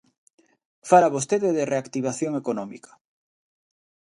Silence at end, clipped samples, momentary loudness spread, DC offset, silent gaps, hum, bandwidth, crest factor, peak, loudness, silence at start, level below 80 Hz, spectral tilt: 1.35 s; under 0.1%; 14 LU; under 0.1%; none; none; 11.5 kHz; 22 dB; -4 dBFS; -23 LUFS; 0.85 s; -72 dBFS; -5.5 dB/octave